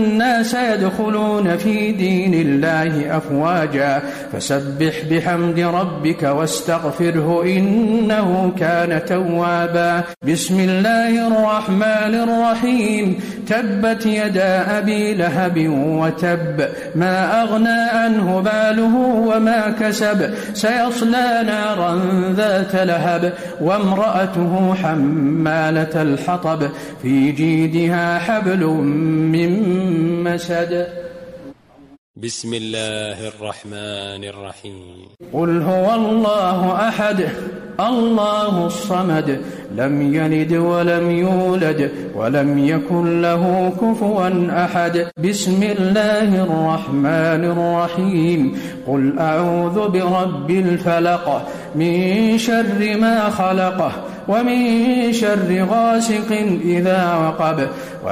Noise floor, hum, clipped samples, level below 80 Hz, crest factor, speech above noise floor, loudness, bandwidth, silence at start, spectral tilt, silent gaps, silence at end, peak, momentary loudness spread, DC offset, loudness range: -43 dBFS; none; under 0.1%; -54 dBFS; 10 dB; 26 dB; -17 LUFS; 15.5 kHz; 0 s; -6 dB/octave; 31.98-32.14 s; 0 s; -8 dBFS; 7 LU; under 0.1%; 3 LU